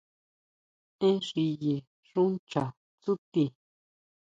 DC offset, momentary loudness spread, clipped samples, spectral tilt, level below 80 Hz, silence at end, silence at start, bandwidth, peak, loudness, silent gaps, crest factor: under 0.1%; 8 LU; under 0.1%; -7.5 dB/octave; -74 dBFS; 0.8 s; 1 s; 7.8 kHz; -12 dBFS; -31 LUFS; 1.87-2.03 s, 2.39-2.47 s, 2.77-2.98 s, 3.18-3.32 s; 18 dB